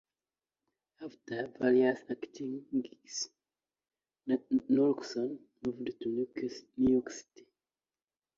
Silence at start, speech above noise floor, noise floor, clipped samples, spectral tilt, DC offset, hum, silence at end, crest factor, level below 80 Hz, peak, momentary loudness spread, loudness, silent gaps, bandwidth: 1 s; over 57 dB; under -90 dBFS; under 0.1%; -5 dB/octave; under 0.1%; none; 1.15 s; 18 dB; -68 dBFS; -16 dBFS; 15 LU; -33 LUFS; none; 7.6 kHz